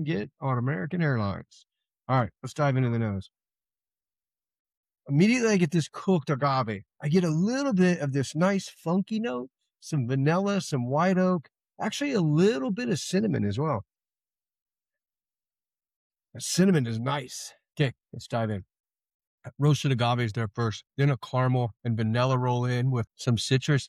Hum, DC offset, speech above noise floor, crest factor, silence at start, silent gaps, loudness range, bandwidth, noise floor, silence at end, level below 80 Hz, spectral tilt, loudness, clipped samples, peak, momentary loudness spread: none; under 0.1%; over 64 dB; 18 dB; 0 s; 4.59-4.65 s, 4.77-4.83 s, 14.62-14.66 s, 15.96-16.10 s, 18.80-18.84 s, 19.14-19.20 s, 19.27-19.38 s; 5 LU; 14 kHz; under -90 dBFS; 0 s; -64 dBFS; -6 dB/octave; -27 LUFS; under 0.1%; -10 dBFS; 10 LU